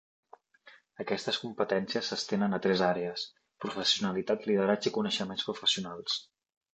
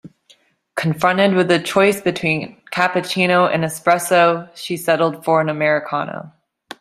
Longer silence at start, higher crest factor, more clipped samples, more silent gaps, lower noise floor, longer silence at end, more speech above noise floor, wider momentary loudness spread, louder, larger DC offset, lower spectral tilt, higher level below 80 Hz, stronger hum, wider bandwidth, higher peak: first, 0.65 s vs 0.05 s; about the same, 20 dB vs 16 dB; neither; neither; first, -59 dBFS vs -55 dBFS; about the same, 0.5 s vs 0.5 s; second, 28 dB vs 38 dB; about the same, 8 LU vs 10 LU; second, -31 LUFS vs -17 LUFS; neither; about the same, -4 dB/octave vs -5 dB/octave; second, -72 dBFS vs -60 dBFS; neither; second, 8.8 kHz vs 15.5 kHz; second, -12 dBFS vs -2 dBFS